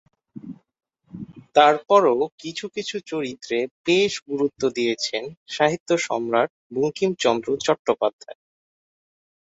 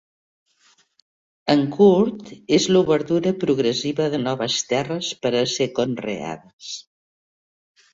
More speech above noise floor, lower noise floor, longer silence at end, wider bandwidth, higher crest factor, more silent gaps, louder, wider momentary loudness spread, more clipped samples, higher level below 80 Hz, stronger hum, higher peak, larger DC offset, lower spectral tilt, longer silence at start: second, 18 dB vs 40 dB; second, -40 dBFS vs -60 dBFS; first, 1.25 s vs 1.1 s; about the same, 8 kHz vs 7.8 kHz; about the same, 22 dB vs 20 dB; first, 2.32-2.38 s, 3.71-3.84 s, 4.22-4.26 s, 5.37-5.46 s, 5.80-5.86 s, 6.50-6.70 s, 7.79-7.85 s, 8.13-8.19 s vs 6.53-6.59 s; about the same, -22 LUFS vs -20 LUFS; second, 15 LU vs 18 LU; neither; second, -66 dBFS vs -60 dBFS; neither; about the same, -2 dBFS vs -2 dBFS; neither; about the same, -4 dB/octave vs -5 dB/octave; second, 0.35 s vs 1.45 s